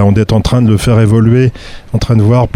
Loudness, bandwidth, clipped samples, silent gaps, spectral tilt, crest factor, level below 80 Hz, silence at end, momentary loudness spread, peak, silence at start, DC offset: -10 LUFS; 12 kHz; under 0.1%; none; -7.5 dB/octave; 8 dB; -26 dBFS; 0.05 s; 7 LU; 0 dBFS; 0 s; under 0.1%